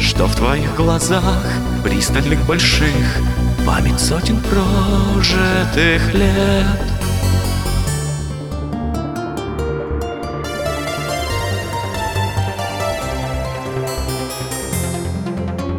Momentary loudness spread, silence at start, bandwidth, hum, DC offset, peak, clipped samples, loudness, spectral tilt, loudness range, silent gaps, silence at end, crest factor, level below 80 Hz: 9 LU; 0 s; 19.5 kHz; none; under 0.1%; 0 dBFS; under 0.1%; -18 LUFS; -5 dB/octave; 7 LU; none; 0 s; 16 dB; -24 dBFS